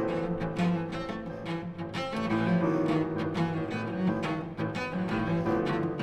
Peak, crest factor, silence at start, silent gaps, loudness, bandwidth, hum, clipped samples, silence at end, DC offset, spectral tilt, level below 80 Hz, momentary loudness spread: -16 dBFS; 14 dB; 0 s; none; -31 LUFS; 9.8 kHz; none; under 0.1%; 0 s; under 0.1%; -7.5 dB/octave; -54 dBFS; 9 LU